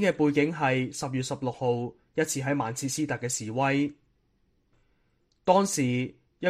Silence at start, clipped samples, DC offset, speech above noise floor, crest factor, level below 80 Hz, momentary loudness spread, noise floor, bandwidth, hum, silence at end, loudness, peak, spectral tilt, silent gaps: 0 s; under 0.1%; under 0.1%; 43 dB; 20 dB; -64 dBFS; 8 LU; -70 dBFS; 15 kHz; none; 0 s; -28 LUFS; -8 dBFS; -5 dB/octave; none